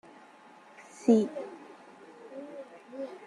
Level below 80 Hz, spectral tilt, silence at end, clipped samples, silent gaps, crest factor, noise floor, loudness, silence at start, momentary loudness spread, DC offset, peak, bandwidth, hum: -82 dBFS; -7 dB/octave; 0 s; under 0.1%; none; 22 dB; -55 dBFS; -29 LUFS; 0.8 s; 27 LU; under 0.1%; -12 dBFS; 10.5 kHz; none